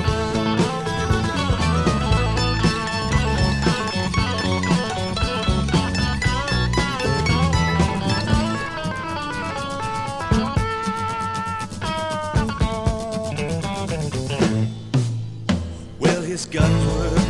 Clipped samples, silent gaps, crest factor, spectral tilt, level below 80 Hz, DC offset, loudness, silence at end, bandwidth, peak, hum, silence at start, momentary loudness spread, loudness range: under 0.1%; none; 18 dB; -5.5 dB/octave; -30 dBFS; under 0.1%; -22 LUFS; 0 s; 12 kHz; -4 dBFS; none; 0 s; 7 LU; 4 LU